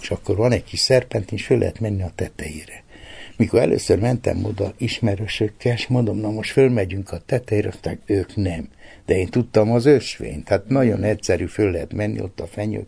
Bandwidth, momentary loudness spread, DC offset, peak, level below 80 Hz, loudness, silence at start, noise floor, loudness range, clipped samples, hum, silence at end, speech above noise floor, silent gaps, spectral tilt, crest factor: 11 kHz; 13 LU; under 0.1%; -2 dBFS; -44 dBFS; -21 LUFS; 0 s; -39 dBFS; 3 LU; under 0.1%; none; 0 s; 19 dB; none; -6 dB/octave; 18 dB